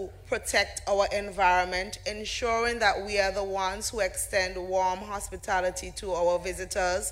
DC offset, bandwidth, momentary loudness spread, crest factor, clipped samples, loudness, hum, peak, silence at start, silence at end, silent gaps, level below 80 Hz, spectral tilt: under 0.1%; 16 kHz; 9 LU; 18 dB; under 0.1%; -28 LUFS; none; -10 dBFS; 0 s; 0 s; none; -46 dBFS; -2.5 dB/octave